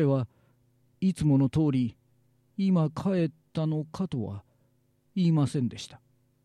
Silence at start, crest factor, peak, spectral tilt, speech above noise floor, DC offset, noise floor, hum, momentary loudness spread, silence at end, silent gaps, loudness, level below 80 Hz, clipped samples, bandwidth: 0 s; 14 dB; -16 dBFS; -8 dB/octave; 42 dB; under 0.1%; -68 dBFS; none; 14 LU; 0.5 s; none; -28 LUFS; -58 dBFS; under 0.1%; 11.5 kHz